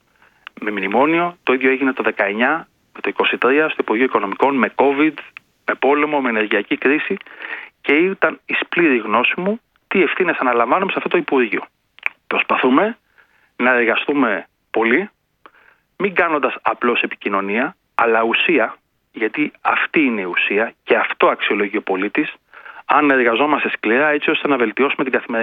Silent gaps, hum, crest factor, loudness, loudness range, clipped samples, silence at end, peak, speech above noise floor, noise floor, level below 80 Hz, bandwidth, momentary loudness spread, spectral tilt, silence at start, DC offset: none; none; 18 dB; -17 LUFS; 2 LU; under 0.1%; 0 s; 0 dBFS; 38 dB; -55 dBFS; -66 dBFS; 4.9 kHz; 9 LU; -7.5 dB/octave; 0.6 s; under 0.1%